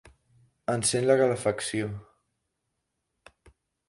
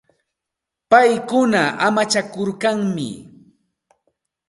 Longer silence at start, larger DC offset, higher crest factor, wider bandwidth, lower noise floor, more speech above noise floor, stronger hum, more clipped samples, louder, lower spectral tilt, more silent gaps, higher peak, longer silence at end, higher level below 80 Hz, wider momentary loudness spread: second, 0.7 s vs 0.9 s; neither; about the same, 22 dB vs 20 dB; about the same, 11.5 kHz vs 11.5 kHz; about the same, -81 dBFS vs -83 dBFS; second, 55 dB vs 66 dB; neither; neither; second, -26 LUFS vs -17 LUFS; about the same, -4 dB/octave vs -4.5 dB/octave; neither; second, -8 dBFS vs 0 dBFS; first, 1.85 s vs 1.25 s; about the same, -62 dBFS vs -64 dBFS; about the same, 14 LU vs 12 LU